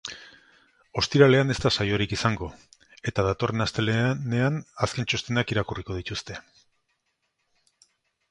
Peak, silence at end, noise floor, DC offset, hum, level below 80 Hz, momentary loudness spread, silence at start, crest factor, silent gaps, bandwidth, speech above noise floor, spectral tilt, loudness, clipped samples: -4 dBFS; 1.9 s; -76 dBFS; under 0.1%; none; -48 dBFS; 16 LU; 0.05 s; 22 dB; none; 11 kHz; 51 dB; -5.5 dB/octave; -25 LUFS; under 0.1%